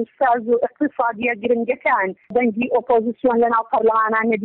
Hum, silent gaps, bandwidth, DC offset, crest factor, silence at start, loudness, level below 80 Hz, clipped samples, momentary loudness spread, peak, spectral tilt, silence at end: none; none; 4.1 kHz; under 0.1%; 12 dB; 0 s; -19 LUFS; -60 dBFS; under 0.1%; 4 LU; -8 dBFS; -9 dB/octave; 0 s